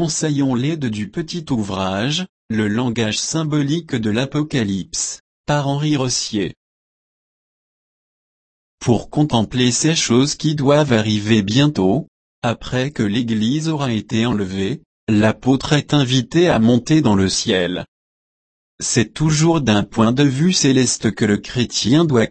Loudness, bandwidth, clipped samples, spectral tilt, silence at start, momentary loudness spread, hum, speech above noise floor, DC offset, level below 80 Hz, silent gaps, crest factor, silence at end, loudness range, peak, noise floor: -18 LUFS; 8.8 kHz; under 0.1%; -5 dB/octave; 0 s; 9 LU; none; over 73 dB; under 0.1%; -46 dBFS; 2.29-2.49 s, 5.20-5.44 s, 6.57-8.78 s, 12.08-12.42 s, 14.86-15.07 s, 17.88-18.78 s; 16 dB; 0 s; 6 LU; -2 dBFS; under -90 dBFS